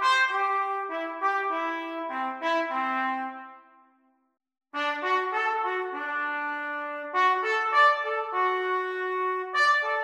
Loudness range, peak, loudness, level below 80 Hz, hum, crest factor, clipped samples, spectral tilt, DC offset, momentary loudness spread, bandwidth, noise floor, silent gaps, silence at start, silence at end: 6 LU; -10 dBFS; -26 LUFS; -86 dBFS; none; 18 dB; under 0.1%; -0.5 dB/octave; under 0.1%; 10 LU; 12 kHz; -67 dBFS; none; 0 s; 0 s